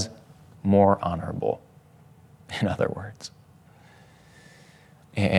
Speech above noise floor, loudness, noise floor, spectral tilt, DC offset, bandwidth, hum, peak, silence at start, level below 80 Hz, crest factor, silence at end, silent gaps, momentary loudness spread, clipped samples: 30 dB; -26 LUFS; -54 dBFS; -6.5 dB/octave; under 0.1%; 12 kHz; none; -4 dBFS; 0 s; -60 dBFS; 24 dB; 0 s; none; 18 LU; under 0.1%